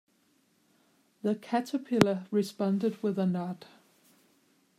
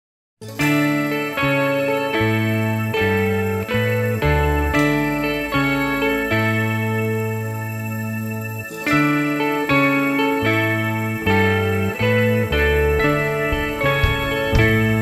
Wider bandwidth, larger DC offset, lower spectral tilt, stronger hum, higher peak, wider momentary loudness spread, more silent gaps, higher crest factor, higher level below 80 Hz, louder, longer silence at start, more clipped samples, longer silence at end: about the same, 15 kHz vs 15.5 kHz; neither; about the same, -6.5 dB/octave vs -6 dB/octave; neither; about the same, -4 dBFS vs -4 dBFS; about the same, 9 LU vs 7 LU; neither; first, 28 dB vs 16 dB; second, -70 dBFS vs -32 dBFS; second, -30 LUFS vs -19 LUFS; first, 1.25 s vs 0.4 s; neither; first, 1.15 s vs 0 s